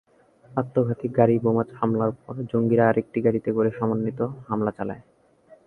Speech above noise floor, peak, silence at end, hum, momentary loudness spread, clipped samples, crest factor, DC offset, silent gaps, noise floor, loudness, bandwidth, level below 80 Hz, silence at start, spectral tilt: 32 dB; -4 dBFS; 0.65 s; none; 11 LU; under 0.1%; 20 dB; under 0.1%; none; -54 dBFS; -24 LUFS; 3.4 kHz; -58 dBFS; 0.5 s; -11 dB/octave